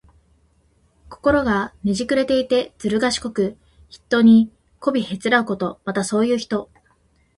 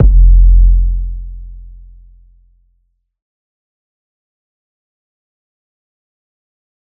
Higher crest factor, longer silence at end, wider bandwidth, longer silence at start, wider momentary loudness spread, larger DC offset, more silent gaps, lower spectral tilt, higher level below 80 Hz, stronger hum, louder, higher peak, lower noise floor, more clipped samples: about the same, 18 dB vs 14 dB; second, 0.75 s vs 5.35 s; first, 11.5 kHz vs 0.6 kHz; first, 1.1 s vs 0 s; second, 10 LU vs 23 LU; neither; neither; second, -5 dB/octave vs -16 dB/octave; second, -48 dBFS vs -14 dBFS; neither; second, -20 LUFS vs -12 LUFS; about the same, -2 dBFS vs 0 dBFS; about the same, -60 dBFS vs -62 dBFS; neither